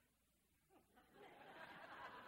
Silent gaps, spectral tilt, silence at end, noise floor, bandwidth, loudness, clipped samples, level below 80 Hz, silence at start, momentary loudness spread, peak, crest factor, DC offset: none; -4 dB/octave; 0 s; -82 dBFS; 16 kHz; -60 LUFS; under 0.1%; -88 dBFS; 0 s; 9 LU; -44 dBFS; 20 dB; under 0.1%